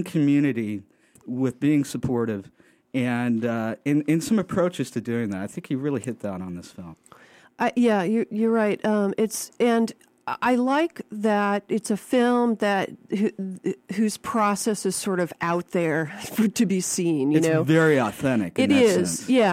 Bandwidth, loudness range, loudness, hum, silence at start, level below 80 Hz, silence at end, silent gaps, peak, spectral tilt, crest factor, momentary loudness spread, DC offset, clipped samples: 16 kHz; 4 LU; -24 LUFS; none; 0 s; -62 dBFS; 0 s; none; -6 dBFS; -5.5 dB/octave; 16 dB; 10 LU; under 0.1%; under 0.1%